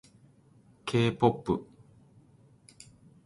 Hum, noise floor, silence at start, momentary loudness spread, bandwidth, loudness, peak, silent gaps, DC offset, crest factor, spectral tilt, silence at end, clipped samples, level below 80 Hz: none; -60 dBFS; 0.85 s; 25 LU; 11.5 kHz; -29 LUFS; -10 dBFS; none; under 0.1%; 24 dB; -7 dB/octave; 1.6 s; under 0.1%; -60 dBFS